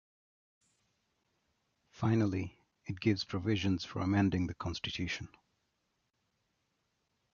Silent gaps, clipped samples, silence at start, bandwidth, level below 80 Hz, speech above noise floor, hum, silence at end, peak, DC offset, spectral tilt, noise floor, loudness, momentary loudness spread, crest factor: none; under 0.1%; 1.95 s; 7.2 kHz; -52 dBFS; 48 dB; none; 2.05 s; -16 dBFS; under 0.1%; -6.5 dB/octave; -81 dBFS; -34 LUFS; 13 LU; 20 dB